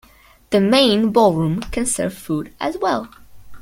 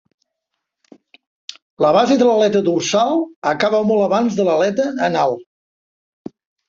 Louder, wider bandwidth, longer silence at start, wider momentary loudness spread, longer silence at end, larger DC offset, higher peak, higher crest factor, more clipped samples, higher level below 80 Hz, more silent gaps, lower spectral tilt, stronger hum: about the same, -18 LUFS vs -16 LUFS; first, 16.5 kHz vs 7.8 kHz; second, 0.5 s vs 1.8 s; second, 12 LU vs 23 LU; second, 0 s vs 1.25 s; neither; about the same, -2 dBFS vs -2 dBFS; about the same, 18 dB vs 16 dB; neither; first, -42 dBFS vs -62 dBFS; second, none vs 3.36-3.42 s; about the same, -4.5 dB/octave vs -5 dB/octave; neither